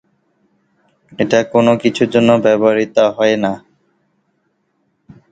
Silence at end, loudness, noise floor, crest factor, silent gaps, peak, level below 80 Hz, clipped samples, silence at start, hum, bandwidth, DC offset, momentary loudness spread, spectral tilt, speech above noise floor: 1.75 s; -13 LUFS; -65 dBFS; 16 dB; none; 0 dBFS; -56 dBFS; under 0.1%; 1.2 s; none; 9 kHz; under 0.1%; 8 LU; -6 dB/octave; 52 dB